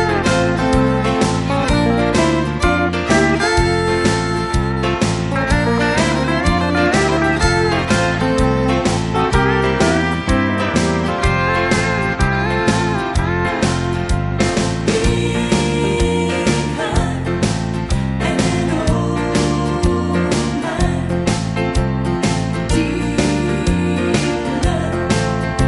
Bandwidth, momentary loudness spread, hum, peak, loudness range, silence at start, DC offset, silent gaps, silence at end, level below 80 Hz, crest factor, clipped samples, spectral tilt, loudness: 11.5 kHz; 4 LU; none; -2 dBFS; 2 LU; 0 s; under 0.1%; none; 0 s; -26 dBFS; 14 dB; under 0.1%; -5.5 dB/octave; -17 LUFS